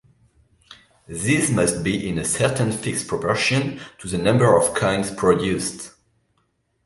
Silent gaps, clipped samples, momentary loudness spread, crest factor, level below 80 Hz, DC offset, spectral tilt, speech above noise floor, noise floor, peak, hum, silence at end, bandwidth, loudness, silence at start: none; under 0.1%; 12 LU; 20 dB; -48 dBFS; under 0.1%; -4.5 dB/octave; 48 dB; -68 dBFS; -2 dBFS; none; 0.95 s; 12 kHz; -20 LUFS; 0.7 s